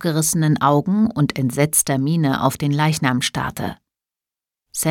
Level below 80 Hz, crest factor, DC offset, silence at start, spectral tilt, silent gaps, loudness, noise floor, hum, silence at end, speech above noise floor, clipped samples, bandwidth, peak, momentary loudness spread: -50 dBFS; 18 dB; under 0.1%; 0 s; -4.5 dB/octave; none; -18 LUFS; -89 dBFS; none; 0 s; 71 dB; under 0.1%; 18.5 kHz; -2 dBFS; 8 LU